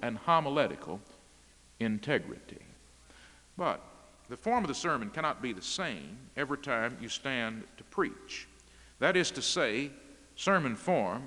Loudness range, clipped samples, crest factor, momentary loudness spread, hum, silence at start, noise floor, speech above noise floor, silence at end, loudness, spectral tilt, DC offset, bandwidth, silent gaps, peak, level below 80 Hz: 6 LU; under 0.1%; 24 dB; 17 LU; none; 0 s; -60 dBFS; 27 dB; 0 s; -32 LUFS; -4 dB/octave; under 0.1%; 12 kHz; none; -10 dBFS; -64 dBFS